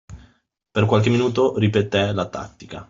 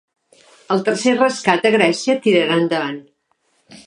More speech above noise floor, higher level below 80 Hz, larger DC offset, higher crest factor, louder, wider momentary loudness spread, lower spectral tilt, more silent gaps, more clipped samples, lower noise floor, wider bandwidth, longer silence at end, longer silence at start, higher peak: second, 41 dB vs 48 dB; first, -52 dBFS vs -70 dBFS; neither; about the same, 18 dB vs 18 dB; second, -20 LUFS vs -17 LUFS; first, 12 LU vs 7 LU; first, -7 dB/octave vs -4.5 dB/octave; neither; neither; second, -61 dBFS vs -65 dBFS; second, 7.6 kHz vs 11.5 kHz; about the same, 0.05 s vs 0.1 s; second, 0.1 s vs 0.7 s; about the same, -2 dBFS vs 0 dBFS